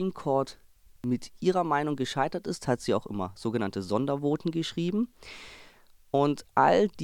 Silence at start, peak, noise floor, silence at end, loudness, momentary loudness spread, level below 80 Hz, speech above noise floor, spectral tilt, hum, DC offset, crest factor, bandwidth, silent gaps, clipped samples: 0 s; -8 dBFS; -56 dBFS; 0 s; -29 LUFS; 11 LU; -60 dBFS; 28 dB; -6 dB/octave; none; under 0.1%; 20 dB; 18 kHz; none; under 0.1%